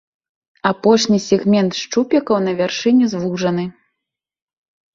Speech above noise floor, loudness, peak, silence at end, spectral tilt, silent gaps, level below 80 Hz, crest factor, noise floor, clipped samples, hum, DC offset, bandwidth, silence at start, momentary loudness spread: 66 dB; -17 LUFS; -2 dBFS; 1.25 s; -5.5 dB/octave; none; -58 dBFS; 16 dB; -81 dBFS; under 0.1%; none; under 0.1%; 7.6 kHz; 0.65 s; 6 LU